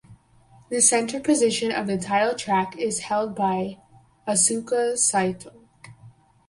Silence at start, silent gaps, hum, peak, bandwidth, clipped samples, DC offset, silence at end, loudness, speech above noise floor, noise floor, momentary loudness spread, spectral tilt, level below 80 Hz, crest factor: 0.1 s; none; none; -4 dBFS; 11.5 kHz; under 0.1%; under 0.1%; 0.4 s; -22 LUFS; 32 dB; -54 dBFS; 10 LU; -3 dB/octave; -62 dBFS; 20 dB